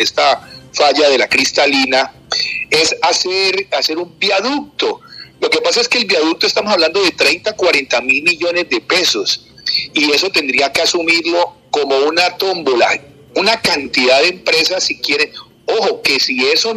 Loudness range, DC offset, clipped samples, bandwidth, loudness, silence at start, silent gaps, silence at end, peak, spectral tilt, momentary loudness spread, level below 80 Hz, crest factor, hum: 2 LU; under 0.1%; under 0.1%; 14.5 kHz; -13 LUFS; 0 s; none; 0 s; 0 dBFS; -1.5 dB/octave; 7 LU; -54 dBFS; 14 dB; none